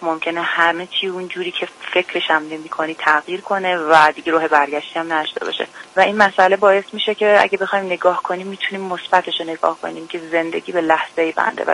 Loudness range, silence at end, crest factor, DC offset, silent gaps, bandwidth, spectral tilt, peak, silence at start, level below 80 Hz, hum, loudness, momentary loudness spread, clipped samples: 4 LU; 0 s; 18 dB; under 0.1%; none; 11.5 kHz; -4 dB/octave; 0 dBFS; 0 s; -66 dBFS; none; -17 LUFS; 11 LU; under 0.1%